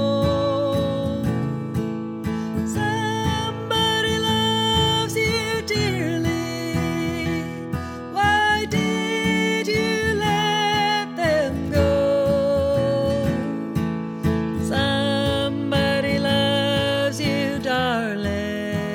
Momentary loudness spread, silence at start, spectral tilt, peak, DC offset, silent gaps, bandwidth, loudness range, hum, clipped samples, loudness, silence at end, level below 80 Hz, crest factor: 7 LU; 0 s; -5 dB/octave; -6 dBFS; under 0.1%; none; 18 kHz; 3 LU; none; under 0.1%; -22 LUFS; 0 s; -42 dBFS; 14 dB